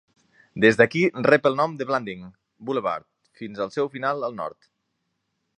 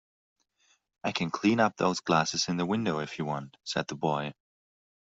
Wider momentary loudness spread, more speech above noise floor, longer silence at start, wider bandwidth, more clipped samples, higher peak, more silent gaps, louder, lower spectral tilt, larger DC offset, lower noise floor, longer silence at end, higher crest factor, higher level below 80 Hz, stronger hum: first, 19 LU vs 9 LU; first, 53 dB vs 41 dB; second, 0.55 s vs 1.05 s; first, 9.8 kHz vs 8 kHz; neither; first, -2 dBFS vs -10 dBFS; neither; first, -22 LUFS vs -29 LUFS; first, -6 dB/octave vs -4.5 dB/octave; neither; first, -76 dBFS vs -70 dBFS; first, 1.1 s vs 0.85 s; about the same, 22 dB vs 20 dB; about the same, -64 dBFS vs -68 dBFS; neither